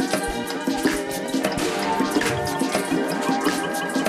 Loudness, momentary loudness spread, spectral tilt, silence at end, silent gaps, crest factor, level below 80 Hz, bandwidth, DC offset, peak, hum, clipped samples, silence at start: -23 LUFS; 4 LU; -4 dB/octave; 0 s; none; 16 dB; -48 dBFS; 15.5 kHz; under 0.1%; -8 dBFS; none; under 0.1%; 0 s